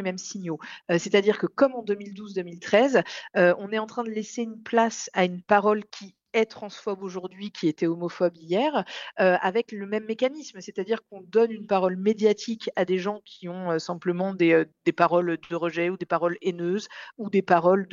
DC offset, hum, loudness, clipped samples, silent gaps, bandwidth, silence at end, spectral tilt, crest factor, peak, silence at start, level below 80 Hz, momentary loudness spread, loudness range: under 0.1%; none; -25 LUFS; under 0.1%; none; 7.6 kHz; 0.05 s; -5.5 dB/octave; 20 dB; -4 dBFS; 0 s; -74 dBFS; 12 LU; 3 LU